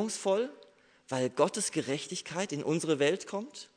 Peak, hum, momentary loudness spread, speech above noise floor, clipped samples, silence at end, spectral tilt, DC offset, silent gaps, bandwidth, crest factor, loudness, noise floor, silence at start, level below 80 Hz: -12 dBFS; none; 9 LU; 28 dB; under 0.1%; 0.1 s; -4 dB/octave; under 0.1%; none; 11 kHz; 20 dB; -32 LUFS; -60 dBFS; 0 s; -80 dBFS